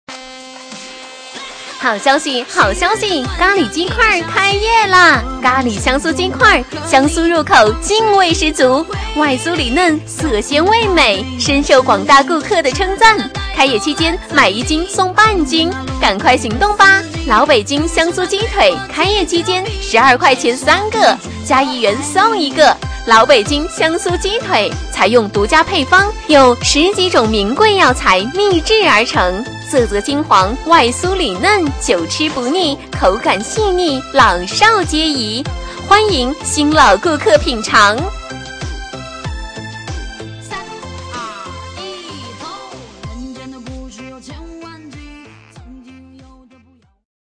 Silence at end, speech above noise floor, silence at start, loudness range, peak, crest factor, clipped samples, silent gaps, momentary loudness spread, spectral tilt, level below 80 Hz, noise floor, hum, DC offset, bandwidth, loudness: 1.3 s; 38 dB; 0.1 s; 16 LU; 0 dBFS; 14 dB; 0.1%; none; 19 LU; -3.5 dB/octave; -30 dBFS; -50 dBFS; none; under 0.1%; 11 kHz; -12 LUFS